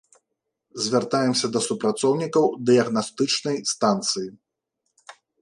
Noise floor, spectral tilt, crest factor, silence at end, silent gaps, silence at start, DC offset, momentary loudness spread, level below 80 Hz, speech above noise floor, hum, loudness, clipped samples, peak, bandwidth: -80 dBFS; -4 dB/octave; 18 dB; 0.3 s; none; 0.75 s; under 0.1%; 7 LU; -70 dBFS; 58 dB; none; -22 LUFS; under 0.1%; -6 dBFS; 11.5 kHz